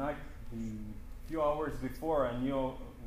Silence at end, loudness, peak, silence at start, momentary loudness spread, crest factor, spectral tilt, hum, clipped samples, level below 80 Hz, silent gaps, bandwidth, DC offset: 0 s; -36 LUFS; -20 dBFS; 0 s; 13 LU; 16 dB; -7.5 dB/octave; none; under 0.1%; -46 dBFS; none; 15.5 kHz; under 0.1%